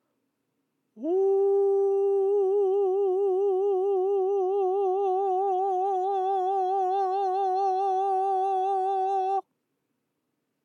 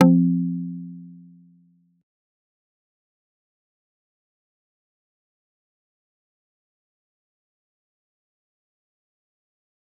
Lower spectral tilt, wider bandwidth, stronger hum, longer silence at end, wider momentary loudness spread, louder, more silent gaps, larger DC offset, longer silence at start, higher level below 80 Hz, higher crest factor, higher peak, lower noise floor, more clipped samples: second, -5 dB/octave vs -9.5 dB/octave; first, 6.4 kHz vs 3 kHz; neither; second, 1.25 s vs 8.85 s; second, 3 LU vs 25 LU; second, -25 LUFS vs -22 LUFS; neither; neither; first, 0.95 s vs 0 s; second, under -90 dBFS vs -84 dBFS; second, 8 dB vs 28 dB; second, -18 dBFS vs -2 dBFS; first, -79 dBFS vs -59 dBFS; neither